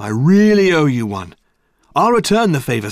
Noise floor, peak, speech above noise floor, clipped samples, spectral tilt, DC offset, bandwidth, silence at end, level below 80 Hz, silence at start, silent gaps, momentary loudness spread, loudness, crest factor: -59 dBFS; -2 dBFS; 46 dB; under 0.1%; -6 dB/octave; under 0.1%; 15.5 kHz; 0 s; -48 dBFS; 0 s; none; 11 LU; -14 LUFS; 12 dB